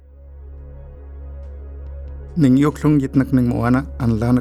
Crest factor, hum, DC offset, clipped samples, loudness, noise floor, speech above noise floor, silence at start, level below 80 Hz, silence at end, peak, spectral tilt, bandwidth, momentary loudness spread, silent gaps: 16 dB; none; under 0.1%; under 0.1%; -17 LUFS; -39 dBFS; 23 dB; 0.2 s; -34 dBFS; 0 s; -2 dBFS; -8.5 dB/octave; 12.5 kHz; 23 LU; none